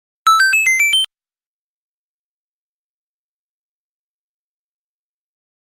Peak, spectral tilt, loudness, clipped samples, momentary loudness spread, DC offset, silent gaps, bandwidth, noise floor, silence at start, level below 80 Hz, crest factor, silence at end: -2 dBFS; 5.5 dB/octave; -12 LUFS; under 0.1%; 5 LU; under 0.1%; none; 15.5 kHz; under -90 dBFS; 0.25 s; -76 dBFS; 20 dB; 4.65 s